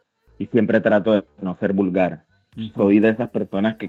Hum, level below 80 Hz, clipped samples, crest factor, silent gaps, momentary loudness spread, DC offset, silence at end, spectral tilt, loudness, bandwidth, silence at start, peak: none; -60 dBFS; under 0.1%; 16 dB; none; 15 LU; under 0.1%; 0 s; -9 dB/octave; -19 LUFS; 4.3 kHz; 0.4 s; -4 dBFS